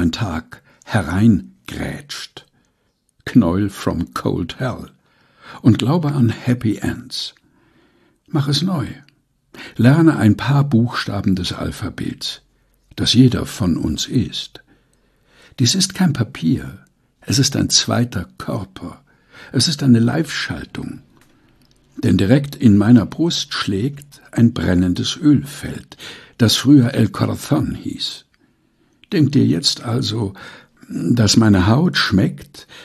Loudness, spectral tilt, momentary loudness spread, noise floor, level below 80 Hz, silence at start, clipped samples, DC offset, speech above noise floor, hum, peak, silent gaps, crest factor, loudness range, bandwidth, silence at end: -17 LUFS; -5 dB/octave; 18 LU; -65 dBFS; -44 dBFS; 0 s; under 0.1%; under 0.1%; 49 dB; none; 0 dBFS; none; 18 dB; 5 LU; 14 kHz; 0 s